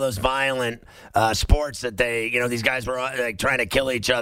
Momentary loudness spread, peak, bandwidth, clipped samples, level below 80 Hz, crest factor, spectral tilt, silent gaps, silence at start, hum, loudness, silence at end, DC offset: 6 LU; -4 dBFS; 16 kHz; under 0.1%; -30 dBFS; 18 dB; -4 dB/octave; none; 0 s; none; -23 LUFS; 0 s; under 0.1%